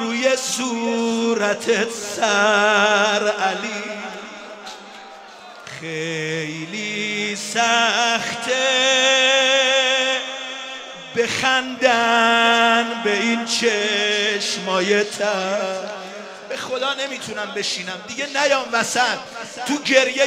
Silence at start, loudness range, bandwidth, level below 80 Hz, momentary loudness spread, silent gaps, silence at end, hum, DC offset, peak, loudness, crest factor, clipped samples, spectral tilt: 0 s; 8 LU; 16 kHz; -70 dBFS; 17 LU; none; 0 s; none; under 0.1%; -2 dBFS; -19 LUFS; 18 dB; under 0.1%; -2 dB/octave